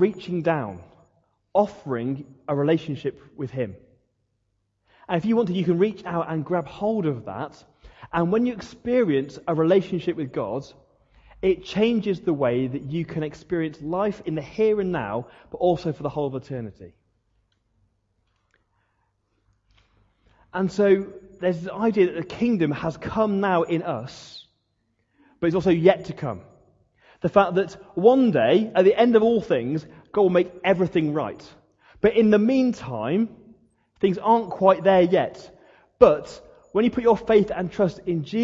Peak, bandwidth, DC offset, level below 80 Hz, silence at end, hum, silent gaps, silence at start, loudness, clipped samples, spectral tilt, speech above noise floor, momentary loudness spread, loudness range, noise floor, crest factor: 0 dBFS; 7.8 kHz; under 0.1%; -56 dBFS; 0 s; none; none; 0 s; -23 LUFS; under 0.1%; -8 dB/octave; 51 dB; 14 LU; 8 LU; -73 dBFS; 24 dB